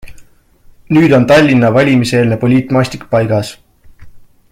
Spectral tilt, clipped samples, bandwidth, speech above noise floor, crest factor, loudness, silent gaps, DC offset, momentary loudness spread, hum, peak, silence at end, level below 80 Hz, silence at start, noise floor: -7 dB/octave; under 0.1%; 15.5 kHz; 33 dB; 12 dB; -10 LUFS; none; under 0.1%; 8 LU; none; 0 dBFS; 0.35 s; -42 dBFS; 0.05 s; -43 dBFS